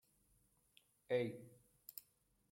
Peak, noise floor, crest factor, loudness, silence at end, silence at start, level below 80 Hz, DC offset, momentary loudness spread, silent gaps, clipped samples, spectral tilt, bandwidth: -26 dBFS; -78 dBFS; 22 dB; -44 LUFS; 0.5 s; 1.1 s; -84 dBFS; under 0.1%; 19 LU; none; under 0.1%; -6 dB/octave; 16.5 kHz